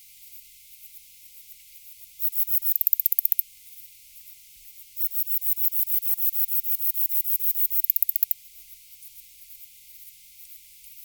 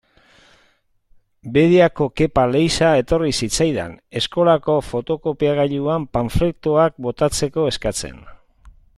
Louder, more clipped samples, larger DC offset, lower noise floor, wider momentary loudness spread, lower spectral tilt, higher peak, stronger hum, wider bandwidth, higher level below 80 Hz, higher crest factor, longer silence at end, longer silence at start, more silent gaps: second, -21 LUFS vs -18 LUFS; neither; neither; second, -49 dBFS vs -60 dBFS; first, 24 LU vs 9 LU; second, 3.5 dB/octave vs -5 dB/octave; about the same, 0 dBFS vs -2 dBFS; first, 50 Hz at -80 dBFS vs none; first, over 20 kHz vs 13.5 kHz; second, -72 dBFS vs -38 dBFS; first, 28 dB vs 18 dB; second, 0 s vs 0.25 s; second, 0.2 s vs 1.45 s; neither